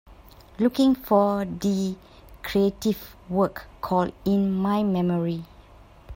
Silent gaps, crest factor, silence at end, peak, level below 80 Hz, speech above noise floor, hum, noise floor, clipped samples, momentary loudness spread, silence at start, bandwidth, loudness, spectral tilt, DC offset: none; 18 dB; 0 s; -8 dBFS; -50 dBFS; 26 dB; none; -49 dBFS; under 0.1%; 10 LU; 0.1 s; 16.5 kHz; -24 LUFS; -7 dB/octave; under 0.1%